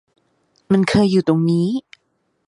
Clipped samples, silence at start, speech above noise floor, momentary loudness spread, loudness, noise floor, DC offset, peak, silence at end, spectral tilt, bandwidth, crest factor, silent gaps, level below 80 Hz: under 0.1%; 0.7 s; 52 dB; 7 LU; -17 LUFS; -68 dBFS; under 0.1%; -4 dBFS; 0.65 s; -7 dB/octave; 11 kHz; 16 dB; none; -50 dBFS